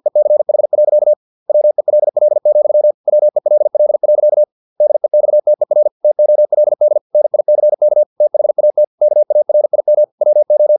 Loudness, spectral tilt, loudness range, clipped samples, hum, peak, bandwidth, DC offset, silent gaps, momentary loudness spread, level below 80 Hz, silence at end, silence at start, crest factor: -12 LUFS; -11.5 dB/octave; 0 LU; under 0.1%; none; -4 dBFS; 1.1 kHz; under 0.1%; 1.16-1.46 s, 2.94-3.04 s, 4.52-4.76 s, 5.91-6.00 s, 7.01-7.10 s, 8.06-8.16 s, 8.87-8.98 s, 10.12-10.18 s; 3 LU; -78 dBFS; 0 s; 0.05 s; 6 dB